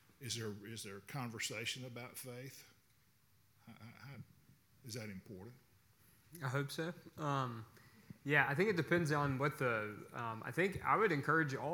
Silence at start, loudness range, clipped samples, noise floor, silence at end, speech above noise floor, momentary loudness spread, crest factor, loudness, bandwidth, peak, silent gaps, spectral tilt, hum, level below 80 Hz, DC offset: 0.2 s; 18 LU; under 0.1%; -73 dBFS; 0 s; 34 dB; 22 LU; 24 dB; -38 LUFS; 18 kHz; -16 dBFS; none; -5 dB/octave; none; -72 dBFS; under 0.1%